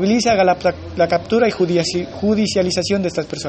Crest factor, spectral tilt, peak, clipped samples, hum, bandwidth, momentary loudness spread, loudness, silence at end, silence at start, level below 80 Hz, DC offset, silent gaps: 12 dB; -5 dB/octave; -4 dBFS; under 0.1%; none; 8.8 kHz; 6 LU; -17 LUFS; 0 s; 0 s; -46 dBFS; under 0.1%; none